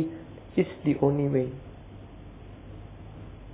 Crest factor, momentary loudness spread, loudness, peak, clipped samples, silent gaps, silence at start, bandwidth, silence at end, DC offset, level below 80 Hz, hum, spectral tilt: 20 dB; 22 LU; -27 LUFS; -10 dBFS; under 0.1%; none; 0 s; 4 kHz; 0 s; under 0.1%; -50 dBFS; none; -8.5 dB/octave